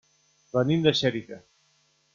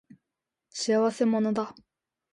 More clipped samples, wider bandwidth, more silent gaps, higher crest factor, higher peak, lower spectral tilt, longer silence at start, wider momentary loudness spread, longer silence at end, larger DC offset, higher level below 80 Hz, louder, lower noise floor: neither; second, 7.4 kHz vs 11 kHz; neither; first, 22 dB vs 16 dB; first, -6 dBFS vs -14 dBFS; about the same, -6 dB/octave vs -5 dB/octave; second, 0.55 s vs 0.75 s; first, 22 LU vs 12 LU; first, 0.75 s vs 0.6 s; neither; first, -64 dBFS vs -74 dBFS; about the same, -25 LUFS vs -26 LUFS; second, -67 dBFS vs -87 dBFS